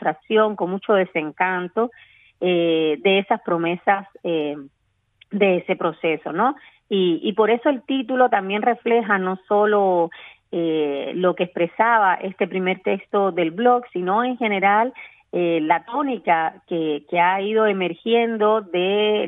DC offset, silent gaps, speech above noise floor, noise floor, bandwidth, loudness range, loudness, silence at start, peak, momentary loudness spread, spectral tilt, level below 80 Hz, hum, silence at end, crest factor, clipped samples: under 0.1%; none; 38 dB; -58 dBFS; 3.9 kHz; 2 LU; -20 LUFS; 0 s; -4 dBFS; 7 LU; -9 dB/octave; -72 dBFS; none; 0 s; 18 dB; under 0.1%